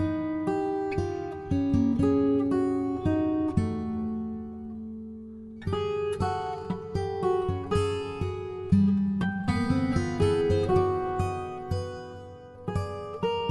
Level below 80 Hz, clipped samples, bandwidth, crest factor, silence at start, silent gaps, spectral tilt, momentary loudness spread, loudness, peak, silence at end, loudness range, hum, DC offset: -46 dBFS; under 0.1%; 11.5 kHz; 18 dB; 0 s; none; -8 dB/octave; 14 LU; -28 LUFS; -10 dBFS; 0 s; 5 LU; none; under 0.1%